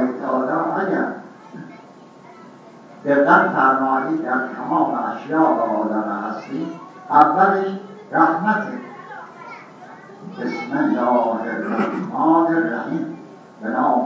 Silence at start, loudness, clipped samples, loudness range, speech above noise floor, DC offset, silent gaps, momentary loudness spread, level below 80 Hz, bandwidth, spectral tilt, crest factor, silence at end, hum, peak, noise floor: 0 s; -19 LUFS; under 0.1%; 5 LU; 25 dB; under 0.1%; none; 22 LU; -76 dBFS; 7.4 kHz; -8 dB/octave; 20 dB; 0 s; none; 0 dBFS; -43 dBFS